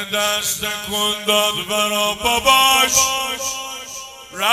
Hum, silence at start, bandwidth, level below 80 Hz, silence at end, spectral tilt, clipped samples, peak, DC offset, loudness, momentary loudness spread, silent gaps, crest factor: none; 0 s; 16.5 kHz; -48 dBFS; 0 s; 0 dB/octave; under 0.1%; 0 dBFS; under 0.1%; -16 LUFS; 16 LU; none; 18 dB